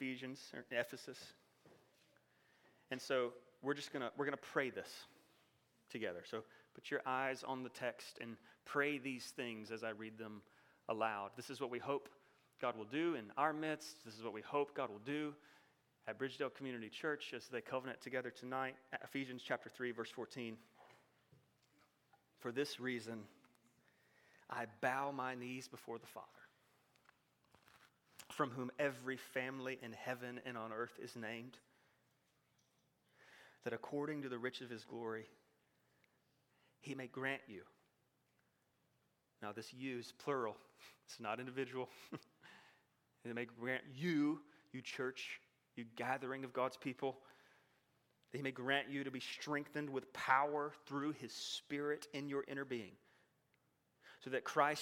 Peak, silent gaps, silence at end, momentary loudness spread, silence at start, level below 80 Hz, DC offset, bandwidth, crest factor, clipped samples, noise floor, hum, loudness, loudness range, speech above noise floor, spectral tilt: -18 dBFS; none; 0 s; 15 LU; 0 s; under -90 dBFS; under 0.1%; 18 kHz; 28 dB; under 0.1%; -81 dBFS; none; -44 LUFS; 8 LU; 37 dB; -4.5 dB/octave